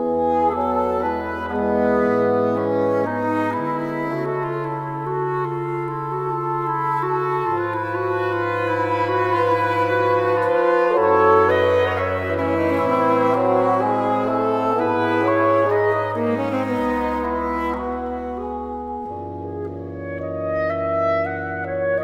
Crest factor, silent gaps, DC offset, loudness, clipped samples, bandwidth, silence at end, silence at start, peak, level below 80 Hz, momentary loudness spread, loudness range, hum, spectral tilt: 16 dB; none; under 0.1%; -21 LUFS; under 0.1%; 13.5 kHz; 0 s; 0 s; -4 dBFS; -48 dBFS; 9 LU; 7 LU; none; -7.5 dB/octave